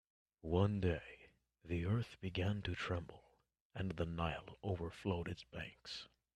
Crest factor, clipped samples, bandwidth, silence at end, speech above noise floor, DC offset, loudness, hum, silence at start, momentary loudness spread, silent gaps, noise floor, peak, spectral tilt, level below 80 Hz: 22 dB; under 0.1%; 9.8 kHz; 0.3 s; 35 dB; under 0.1%; -42 LUFS; none; 0.45 s; 13 LU; 3.61-3.70 s; -76 dBFS; -20 dBFS; -7 dB/octave; -60 dBFS